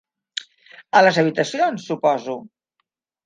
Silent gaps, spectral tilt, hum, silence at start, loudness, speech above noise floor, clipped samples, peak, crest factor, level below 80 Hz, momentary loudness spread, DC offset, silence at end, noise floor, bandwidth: none; -4.5 dB/octave; none; 0.35 s; -19 LUFS; 57 dB; under 0.1%; -2 dBFS; 20 dB; -74 dBFS; 17 LU; under 0.1%; 0.8 s; -75 dBFS; 9.6 kHz